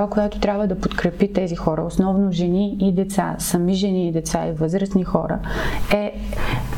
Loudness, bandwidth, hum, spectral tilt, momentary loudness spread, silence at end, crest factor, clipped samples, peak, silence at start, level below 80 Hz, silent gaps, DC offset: -21 LUFS; 17 kHz; none; -6 dB/octave; 5 LU; 0 s; 16 dB; under 0.1%; -4 dBFS; 0 s; -32 dBFS; none; under 0.1%